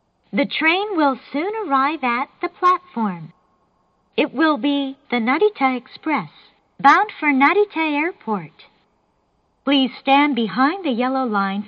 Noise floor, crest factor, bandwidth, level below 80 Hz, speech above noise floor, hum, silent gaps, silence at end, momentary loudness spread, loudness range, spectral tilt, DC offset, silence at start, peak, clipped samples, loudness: -65 dBFS; 18 dB; 7 kHz; -70 dBFS; 46 dB; none; none; 0 s; 10 LU; 3 LU; -6 dB/octave; under 0.1%; 0.35 s; -2 dBFS; under 0.1%; -19 LUFS